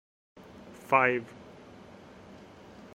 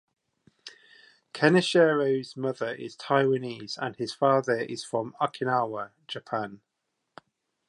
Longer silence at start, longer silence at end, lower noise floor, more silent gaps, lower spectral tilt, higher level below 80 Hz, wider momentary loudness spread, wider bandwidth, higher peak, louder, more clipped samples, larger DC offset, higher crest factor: about the same, 0.65 s vs 0.65 s; first, 1.7 s vs 1.1 s; second, -51 dBFS vs -81 dBFS; neither; about the same, -6 dB/octave vs -5.5 dB/octave; first, -68 dBFS vs -76 dBFS; first, 26 LU vs 18 LU; first, 16 kHz vs 11.5 kHz; about the same, -8 dBFS vs -6 dBFS; about the same, -26 LUFS vs -27 LUFS; neither; neither; about the same, 26 dB vs 22 dB